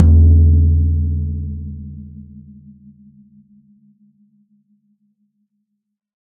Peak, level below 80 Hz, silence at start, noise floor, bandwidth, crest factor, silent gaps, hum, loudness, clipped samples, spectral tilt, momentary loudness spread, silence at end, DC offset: 0 dBFS; -24 dBFS; 0 s; -75 dBFS; 0.8 kHz; 18 dB; none; none; -15 LUFS; under 0.1%; -15 dB/octave; 26 LU; 3.85 s; under 0.1%